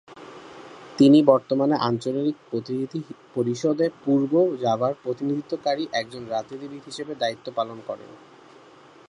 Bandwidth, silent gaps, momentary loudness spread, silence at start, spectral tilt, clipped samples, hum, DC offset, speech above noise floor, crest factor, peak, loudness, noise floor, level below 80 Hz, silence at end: 10.5 kHz; none; 18 LU; 0.1 s; -6.5 dB/octave; under 0.1%; none; under 0.1%; 27 dB; 22 dB; -2 dBFS; -23 LUFS; -50 dBFS; -70 dBFS; 0.95 s